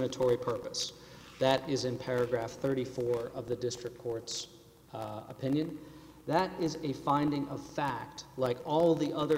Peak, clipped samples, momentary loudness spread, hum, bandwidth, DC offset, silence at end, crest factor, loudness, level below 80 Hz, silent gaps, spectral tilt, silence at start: -12 dBFS; under 0.1%; 13 LU; none; 16 kHz; under 0.1%; 0 s; 20 dB; -33 LUFS; -62 dBFS; none; -5.5 dB/octave; 0 s